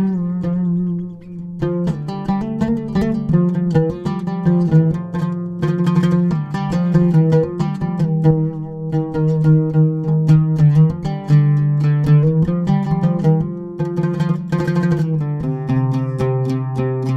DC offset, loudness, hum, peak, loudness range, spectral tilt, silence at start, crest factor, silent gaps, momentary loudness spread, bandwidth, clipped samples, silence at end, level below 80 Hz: under 0.1%; -17 LUFS; none; -2 dBFS; 5 LU; -10 dB/octave; 0 s; 14 dB; none; 9 LU; 6.2 kHz; under 0.1%; 0 s; -42 dBFS